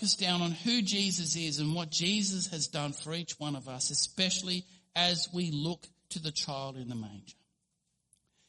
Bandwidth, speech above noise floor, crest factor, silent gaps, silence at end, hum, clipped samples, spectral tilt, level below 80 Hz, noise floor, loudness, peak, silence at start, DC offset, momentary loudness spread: 11.5 kHz; 47 dB; 22 dB; none; 1.15 s; none; under 0.1%; -3 dB/octave; -70 dBFS; -80 dBFS; -31 LUFS; -12 dBFS; 0 s; under 0.1%; 11 LU